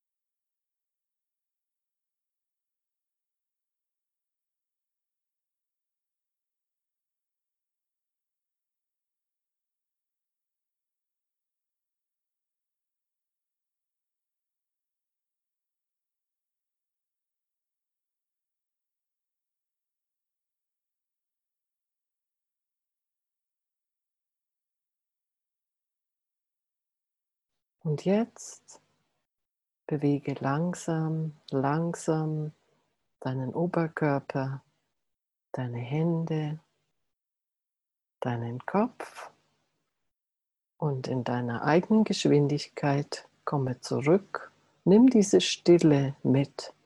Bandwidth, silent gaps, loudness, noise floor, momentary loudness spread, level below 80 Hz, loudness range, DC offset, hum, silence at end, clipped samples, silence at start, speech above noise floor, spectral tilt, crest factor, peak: 11.5 kHz; none; -27 LUFS; -90 dBFS; 15 LU; -74 dBFS; 11 LU; under 0.1%; none; 0.15 s; under 0.1%; 27.85 s; 63 dB; -6.5 dB/octave; 24 dB; -10 dBFS